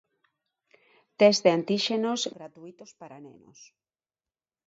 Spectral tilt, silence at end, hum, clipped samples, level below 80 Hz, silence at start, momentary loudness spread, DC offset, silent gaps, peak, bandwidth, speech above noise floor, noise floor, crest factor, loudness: -4 dB/octave; 1.4 s; none; under 0.1%; -78 dBFS; 1.2 s; 27 LU; under 0.1%; none; -6 dBFS; 8 kHz; over 63 dB; under -90 dBFS; 22 dB; -24 LUFS